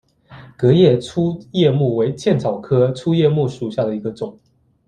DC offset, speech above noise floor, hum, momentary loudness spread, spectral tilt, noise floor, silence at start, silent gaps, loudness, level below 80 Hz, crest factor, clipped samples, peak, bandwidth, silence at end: under 0.1%; 26 dB; none; 10 LU; -8 dB/octave; -42 dBFS; 0.3 s; none; -17 LUFS; -54 dBFS; 16 dB; under 0.1%; -2 dBFS; 9.8 kHz; 0.55 s